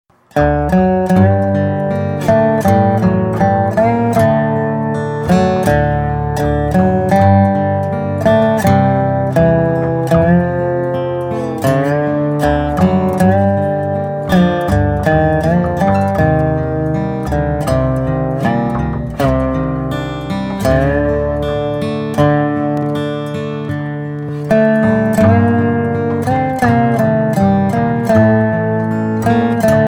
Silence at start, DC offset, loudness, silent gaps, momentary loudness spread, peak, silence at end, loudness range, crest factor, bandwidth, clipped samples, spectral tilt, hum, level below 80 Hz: 0.35 s; under 0.1%; -14 LUFS; none; 7 LU; 0 dBFS; 0 s; 3 LU; 14 dB; 17.5 kHz; under 0.1%; -8 dB/octave; none; -30 dBFS